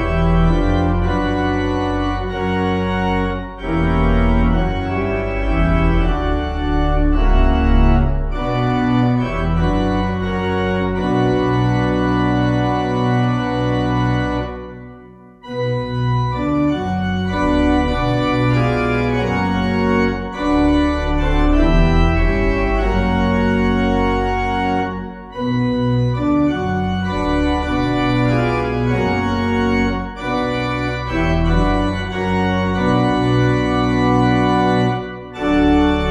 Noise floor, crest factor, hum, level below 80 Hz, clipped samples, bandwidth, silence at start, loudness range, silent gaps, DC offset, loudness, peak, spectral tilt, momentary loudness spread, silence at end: -41 dBFS; 16 dB; none; -22 dBFS; under 0.1%; 8.4 kHz; 0 s; 3 LU; none; under 0.1%; -18 LUFS; -2 dBFS; -7.5 dB/octave; 5 LU; 0 s